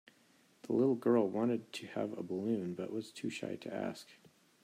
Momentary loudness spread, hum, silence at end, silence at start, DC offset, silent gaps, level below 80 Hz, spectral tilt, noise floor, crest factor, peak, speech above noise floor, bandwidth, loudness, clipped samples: 11 LU; none; 0.5 s; 0.65 s; under 0.1%; none; -84 dBFS; -6.5 dB/octave; -68 dBFS; 18 dB; -18 dBFS; 33 dB; 15 kHz; -36 LUFS; under 0.1%